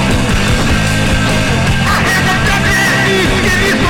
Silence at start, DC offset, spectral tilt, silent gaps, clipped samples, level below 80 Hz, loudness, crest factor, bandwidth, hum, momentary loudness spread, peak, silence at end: 0 s; under 0.1%; -4.5 dB/octave; none; under 0.1%; -20 dBFS; -11 LUFS; 10 dB; 18 kHz; none; 2 LU; -2 dBFS; 0 s